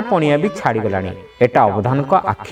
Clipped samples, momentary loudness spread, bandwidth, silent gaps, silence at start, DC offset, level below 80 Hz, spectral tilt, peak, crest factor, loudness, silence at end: under 0.1%; 7 LU; 12 kHz; none; 0 s; under 0.1%; -50 dBFS; -7.5 dB/octave; 0 dBFS; 16 dB; -16 LUFS; 0 s